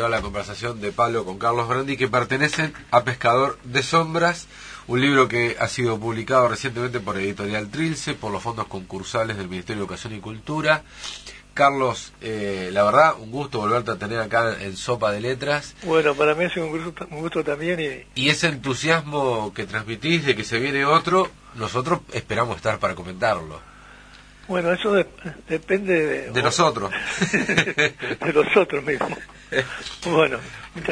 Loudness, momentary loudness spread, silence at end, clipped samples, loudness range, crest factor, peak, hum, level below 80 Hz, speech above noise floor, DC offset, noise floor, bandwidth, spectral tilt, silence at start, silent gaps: -22 LUFS; 11 LU; 0 s; under 0.1%; 5 LU; 20 dB; -2 dBFS; none; -50 dBFS; 24 dB; under 0.1%; -46 dBFS; 10.5 kHz; -4.5 dB/octave; 0 s; none